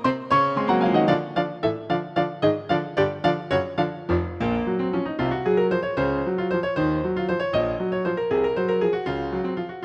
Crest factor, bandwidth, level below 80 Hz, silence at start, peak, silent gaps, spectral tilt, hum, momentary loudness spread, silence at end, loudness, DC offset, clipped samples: 16 dB; 7.8 kHz; -46 dBFS; 0 s; -6 dBFS; none; -8 dB/octave; none; 6 LU; 0 s; -24 LUFS; under 0.1%; under 0.1%